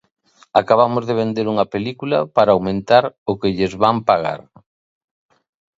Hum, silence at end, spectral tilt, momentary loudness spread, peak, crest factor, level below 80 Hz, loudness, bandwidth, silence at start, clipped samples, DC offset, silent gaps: none; 1.4 s; -7 dB/octave; 7 LU; 0 dBFS; 18 dB; -52 dBFS; -17 LUFS; 7.8 kHz; 0.55 s; under 0.1%; under 0.1%; 3.18-3.26 s